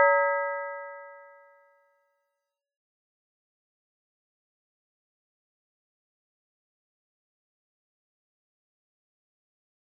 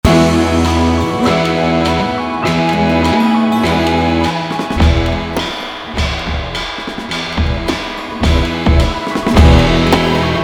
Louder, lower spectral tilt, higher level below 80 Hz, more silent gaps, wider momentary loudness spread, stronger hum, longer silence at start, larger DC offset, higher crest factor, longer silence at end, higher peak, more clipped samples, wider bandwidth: second, -27 LUFS vs -14 LUFS; second, 3 dB/octave vs -6 dB/octave; second, under -90 dBFS vs -22 dBFS; neither; first, 24 LU vs 10 LU; neither; about the same, 0 s vs 0.05 s; neither; first, 28 dB vs 12 dB; first, 8.75 s vs 0 s; second, -8 dBFS vs 0 dBFS; neither; second, 2.1 kHz vs 18.5 kHz